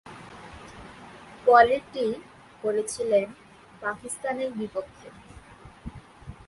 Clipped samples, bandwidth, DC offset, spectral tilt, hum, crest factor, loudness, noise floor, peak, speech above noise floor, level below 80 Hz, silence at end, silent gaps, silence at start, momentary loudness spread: under 0.1%; 11.5 kHz; under 0.1%; -4 dB/octave; none; 24 dB; -25 LUFS; -48 dBFS; -4 dBFS; 24 dB; -56 dBFS; 0.15 s; none; 0.05 s; 27 LU